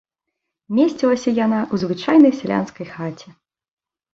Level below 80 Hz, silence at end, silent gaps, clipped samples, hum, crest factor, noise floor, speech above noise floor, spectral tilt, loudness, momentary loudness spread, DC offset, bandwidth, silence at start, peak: -60 dBFS; 0.85 s; none; under 0.1%; none; 18 dB; -80 dBFS; 62 dB; -6.5 dB/octave; -18 LUFS; 16 LU; under 0.1%; 7.8 kHz; 0.7 s; -2 dBFS